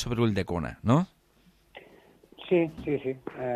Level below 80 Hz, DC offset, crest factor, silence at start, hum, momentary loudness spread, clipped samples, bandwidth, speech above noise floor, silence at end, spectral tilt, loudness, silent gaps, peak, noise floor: -52 dBFS; under 0.1%; 20 dB; 0 s; none; 10 LU; under 0.1%; 13.5 kHz; 35 dB; 0 s; -7.5 dB/octave; -28 LUFS; none; -8 dBFS; -63 dBFS